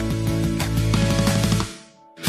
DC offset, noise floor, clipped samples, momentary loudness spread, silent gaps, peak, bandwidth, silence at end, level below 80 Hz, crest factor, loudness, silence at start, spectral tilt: under 0.1%; -44 dBFS; under 0.1%; 7 LU; none; -6 dBFS; 15.5 kHz; 0 s; -32 dBFS; 16 dB; -21 LUFS; 0 s; -5.5 dB/octave